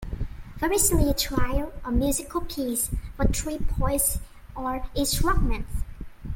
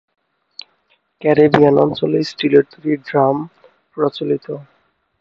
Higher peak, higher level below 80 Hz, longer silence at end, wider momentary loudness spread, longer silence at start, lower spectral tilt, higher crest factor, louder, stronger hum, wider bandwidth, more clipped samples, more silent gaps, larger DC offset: second, -8 dBFS vs 0 dBFS; first, -30 dBFS vs -56 dBFS; second, 0 s vs 0.6 s; second, 14 LU vs 24 LU; second, 0 s vs 1.2 s; second, -4 dB/octave vs -7.5 dB/octave; about the same, 16 dB vs 18 dB; second, -26 LUFS vs -16 LUFS; neither; first, 17 kHz vs 7.2 kHz; neither; neither; neither